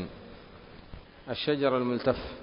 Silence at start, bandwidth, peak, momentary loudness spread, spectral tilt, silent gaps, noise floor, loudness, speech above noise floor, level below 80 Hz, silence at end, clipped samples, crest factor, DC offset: 0 s; 5.4 kHz; -10 dBFS; 23 LU; -10 dB/octave; none; -49 dBFS; -29 LUFS; 21 dB; -52 dBFS; 0 s; under 0.1%; 22 dB; under 0.1%